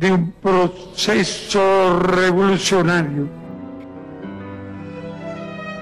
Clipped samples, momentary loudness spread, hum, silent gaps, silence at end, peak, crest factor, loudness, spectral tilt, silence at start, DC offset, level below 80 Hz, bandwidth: under 0.1%; 18 LU; none; none; 0 s; -8 dBFS; 10 dB; -17 LUFS; -5 dB/octave; 0 s; under 0.1%; -48 dBFS; 12.5 kHz